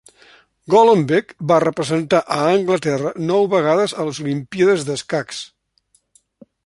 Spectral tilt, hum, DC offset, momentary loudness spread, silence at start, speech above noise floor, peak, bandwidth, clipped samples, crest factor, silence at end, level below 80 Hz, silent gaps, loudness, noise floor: -5.5 dB/octave; none; under 0.1%; 10 LU; 0.7 s; 45 dB; -2 dBFS; 11.5 kHz; under 0.1%; 16 dB; 1.2 s; -60 dBFS; none; -17 LUFS; -62 dBFS